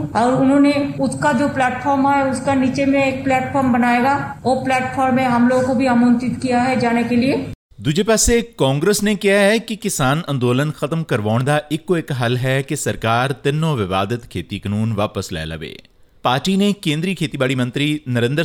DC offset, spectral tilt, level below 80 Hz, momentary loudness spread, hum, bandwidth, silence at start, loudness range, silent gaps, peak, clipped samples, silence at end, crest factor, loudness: under 0.1%; -5 dB/octave; -42 dBFS; 8 LU; none; 18 kHz; 0 s; 4 LU; 7.55-7.70 s; -2 dBFS; under 0.1%; 0 s; 14 dB; -17 LUFS